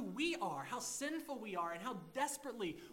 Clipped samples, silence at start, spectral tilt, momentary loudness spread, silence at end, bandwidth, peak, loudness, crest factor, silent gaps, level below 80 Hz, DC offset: under 0.1%; 0 s; -3 dB/octave; 6 LU; 0 s; 16 kHz; -26 dBFS; -42 LUFS; 16 dB; none; -76 dBFS; under 0.1%